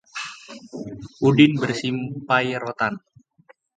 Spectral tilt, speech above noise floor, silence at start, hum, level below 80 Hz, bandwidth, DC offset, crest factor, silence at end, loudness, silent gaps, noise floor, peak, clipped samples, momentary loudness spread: -6 dB/octave; 35 dB; 0.15 s; none; -60 dBFS; 9.2 kHz; under 0.1%; 22 dB; 0.8 s; -21 LUFS; none; -56 dBFS; 0 dBFS; under 0.1%; 21 LU